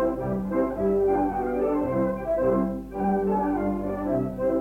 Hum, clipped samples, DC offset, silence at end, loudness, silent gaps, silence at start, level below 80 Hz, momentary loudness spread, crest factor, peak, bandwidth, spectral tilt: none; under 0.1%; under 0.1%; 0 s; -25 LUFS; none; 0 s; -44 dBFS; 4 LU; 12 dB; -14 dBFS; 16.5 kHz; -10 dB/octave